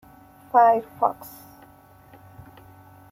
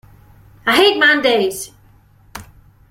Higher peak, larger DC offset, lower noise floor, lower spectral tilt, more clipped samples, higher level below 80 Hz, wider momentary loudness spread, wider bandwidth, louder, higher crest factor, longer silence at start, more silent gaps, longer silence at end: second, -4 dBFS vs 0 dBFS; neither; about the same, -51 dBFS vs -49 dBFS; first, -6 dB/octave vs -2.5 dB/octave; neither; second, -64 dBFS vs -50 dBFS; about the same, 25 LU vs 25 LU; about the same, 16 kHz vs 16.5 kHz; second, -21 LUFS vs -13 LUFS; about the same, 22 dB vs 18 dB; about the same, 0.55 s vs 0.65 s; neither; first, 1.85 s vs 0.5 s